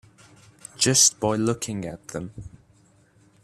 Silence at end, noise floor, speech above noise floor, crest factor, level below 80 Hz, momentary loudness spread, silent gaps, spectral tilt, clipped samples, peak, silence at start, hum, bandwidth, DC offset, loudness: 0.95 s; -58 dBFS; 35 dB; 22 dB; -56 dBFS; 23 LU; none; -2.5 dB/octave; under 0.1%; -4 dBFS; 0.8 s; none; 15.5 kHz; under 0.1%; -21 LUFS